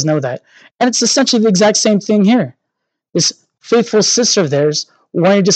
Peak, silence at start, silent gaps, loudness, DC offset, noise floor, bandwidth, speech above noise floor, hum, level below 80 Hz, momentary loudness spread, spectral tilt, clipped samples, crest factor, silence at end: 0 dBFS; 0 s; 0.71-0.75 s; -13 LUFS; under 0.1%; -75 dBFS; 9.2 kHz; 62 dB; none; -70 dBFS; 11 LU; -4 dB/octave; under 0.1%; 14 dB; 0 s